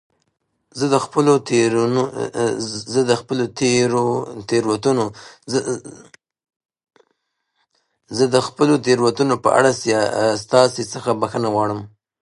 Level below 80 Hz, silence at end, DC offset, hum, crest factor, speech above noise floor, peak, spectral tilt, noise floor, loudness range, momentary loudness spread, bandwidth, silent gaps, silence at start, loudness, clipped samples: -58 dBFS; 0.35 s; under 0.1%; none; 20 dB; 53 dB; 0 dBFS; -5 dB/octave; -71 dBFS; 8 LU; 9 LU; 11 kHz; 6.56-6.60 s; 0.75 s; -18 LUFS; under 0.1%